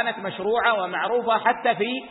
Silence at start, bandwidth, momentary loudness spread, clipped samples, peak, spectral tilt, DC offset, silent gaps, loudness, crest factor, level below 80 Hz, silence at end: 0 s; 4.1 kHz; 5 LU; under 0.1%; -6 dBFS; -8.5 dB/octave; under 0.1%; none; -23 LUFS; 18 dB; -66 dBFS; 0 s